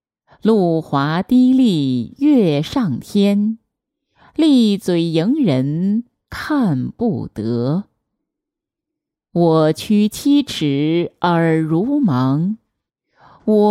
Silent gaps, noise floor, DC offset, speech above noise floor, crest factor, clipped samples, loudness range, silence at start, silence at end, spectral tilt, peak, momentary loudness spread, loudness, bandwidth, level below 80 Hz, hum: none; -83 dBFS; under 0.1%; 68 dB; 14 dB; under 0.1%; 5 LU; 0.45 s; 0 s; -7 dB/octave; -2 dBFS; 9 LU; -17 LUFS; 15.5 kHz; -54 dBFS; none